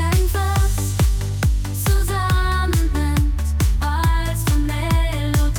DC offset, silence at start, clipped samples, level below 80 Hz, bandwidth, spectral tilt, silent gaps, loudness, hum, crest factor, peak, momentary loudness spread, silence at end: under 0.1%; 0 s; under 0.1%; -20 dBFS; 19 kHz; -5 dB/octave; none; -20 LUFS; none; 10 dB; -8 dBFS; 2 LU; 0 s